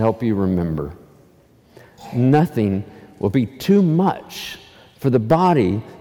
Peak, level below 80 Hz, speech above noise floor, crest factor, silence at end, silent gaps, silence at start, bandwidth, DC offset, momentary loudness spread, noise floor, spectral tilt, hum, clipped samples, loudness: -4 dBFS; -48 dBFS; 34 dB; 16 dB; 0.05 s; none; 0 s; 17.5 kHz; under 0.1%; 15 LU; -52 dBFS; -8 dB/octave; none; under 0.1%; -19 LUFS